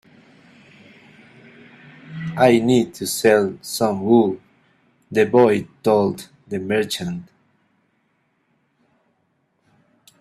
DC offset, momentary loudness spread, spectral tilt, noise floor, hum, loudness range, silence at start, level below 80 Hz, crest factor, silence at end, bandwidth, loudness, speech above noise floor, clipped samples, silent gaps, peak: under 0.1%; 15 LU; -5.5 dB/octave; -67 dBFS; none; 11 LU; 2.05 s; -60 dBFS; 20 dB; 3 s; 15 kHz; -19 LUFS; 49 dB; under 0.1%; none; -2 dBFS